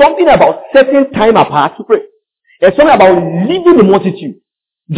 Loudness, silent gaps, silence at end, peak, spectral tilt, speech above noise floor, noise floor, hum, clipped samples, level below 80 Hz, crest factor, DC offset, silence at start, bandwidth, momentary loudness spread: -8 LUFS; none; 0 s; 0 dBFS; -10.5 dB/octave; 43 dB; -51 dBFS; none; 2%; -42 dBFS; 8 dB; under 0.1%; 0 s; 4 kHz; 8 LU